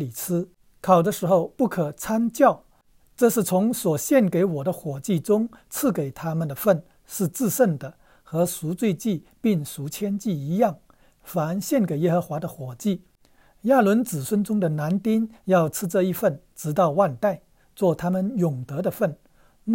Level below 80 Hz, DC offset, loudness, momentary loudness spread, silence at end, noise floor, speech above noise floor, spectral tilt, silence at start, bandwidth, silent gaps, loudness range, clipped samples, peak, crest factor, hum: -60 dBFS; under 0.1%; -24 LUFS; 11 LU; 0 s; -59 dBFS; 36 dB; -6.5 dB/octave; 0 s; 16.5 kHz; none; 4 LU; under 0.1%; -4 dBFS; 20 dB; none